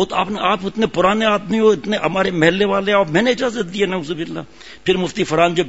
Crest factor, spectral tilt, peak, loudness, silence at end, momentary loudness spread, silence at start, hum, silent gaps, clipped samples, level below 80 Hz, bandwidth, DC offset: 18 dB; -5 dB/octave; 0 dBFS; -17 LUFS; 0 s; 9 LU; 0 s; none; none; under 0.1%; -48 dBFS; 8 kHz; 0.6%